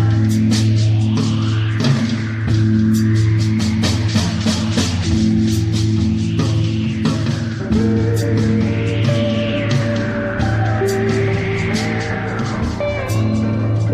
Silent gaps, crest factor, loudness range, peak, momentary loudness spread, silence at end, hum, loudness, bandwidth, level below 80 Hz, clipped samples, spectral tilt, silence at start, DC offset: none; 12 dB; 2 LU; -4 dBFS; 5 LU; 0 s; none; -17 LUFS; 13.5 kHz; -34 dBFS; under 0.1%; -6.5 dB/octave; 0 s; under 0.1%